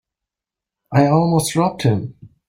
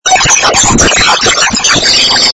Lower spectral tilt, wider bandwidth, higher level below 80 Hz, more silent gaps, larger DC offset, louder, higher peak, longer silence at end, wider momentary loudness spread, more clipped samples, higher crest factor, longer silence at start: first, -6.5 dB/octave vs -1 dB/octave; first, 16.5 kHz vs 11 kHz; second, -52 dBFS vs -26 dBFS; neither; neither; second, -17 LUFS vs -5 LUFS; about the same, -2 dBFS vs 0 dBFS; first, 0.2 s vs 0 s; first, 8 LU vs 2 LU; second, under 0.1% vs 2%; first, 16 dB vs 8 dB; first, 0.9 s vs 0.05 s